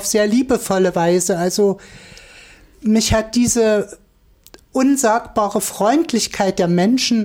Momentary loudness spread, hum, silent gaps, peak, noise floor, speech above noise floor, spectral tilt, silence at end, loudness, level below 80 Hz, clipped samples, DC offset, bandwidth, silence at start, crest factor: 5 LU; none; none; -4 dBFS; -51 dBFS; 35 dB; -4.5 dB/octave; 0 s; -17 LUFS; -42 dBFS; under 0.1%; under 0.1%; 17 kHz; 0 s; 14 dB